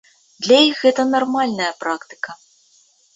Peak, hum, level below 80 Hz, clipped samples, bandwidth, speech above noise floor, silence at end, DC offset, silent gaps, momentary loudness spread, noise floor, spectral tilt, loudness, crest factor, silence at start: -2 dBFS; none; -66 dBFS; under 0.1%; 8 kHz; 39 dB; 0.8 s; under 0.1%; none; 17 LU; -56 dBFS; -3 dB/octave; -17 LUFS; 18 dB; 0.4 s